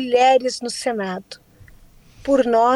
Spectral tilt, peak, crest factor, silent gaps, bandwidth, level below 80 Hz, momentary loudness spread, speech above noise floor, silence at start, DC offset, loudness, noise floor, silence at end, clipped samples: -3.5 dB/octave; -6 dBFS; 14 dB; none; 12.5 kHz; -52 dBFS; 19 LU; 29 dB; 0 s; under 0.1%; -19 LUFS; -47 dBFS; 0 s; under 0.1%